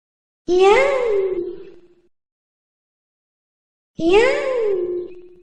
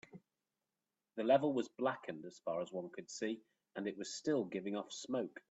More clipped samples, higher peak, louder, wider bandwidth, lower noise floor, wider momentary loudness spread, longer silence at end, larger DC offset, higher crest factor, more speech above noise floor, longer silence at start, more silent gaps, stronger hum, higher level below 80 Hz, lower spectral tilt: neither; first, -2 dBFS vs -18 dBFS; first, -18 LUFS vs -40 LUFS; first, 9.4 kHz vs 8.2 kHz; second, -48 dBFS vs under -90 dBFS; first, 19 LU vs 15 LU; about the same, 0.15 s vs 0.1 s; neither; about the same, 18 dB vs 22 dB; second, 33 dB vs over 51 dB; first, 0.5 s vs 0.15 s; first, 2.32-3.94 s vs none; neither; first, -46 dBFS vs -86 dBFS; about the same, -4 dB/octave vs -5 dB/octave